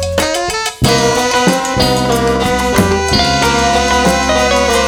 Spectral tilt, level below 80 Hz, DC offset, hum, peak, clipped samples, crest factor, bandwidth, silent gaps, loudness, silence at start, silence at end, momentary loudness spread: -3.5 dB/octave; -26 dBFS; under 0.1%; none; 0 dBFS; under 0.1%; 12 dB; over 20 kHz; none; -12 LUFS; 0 s; 0 s; 3 LU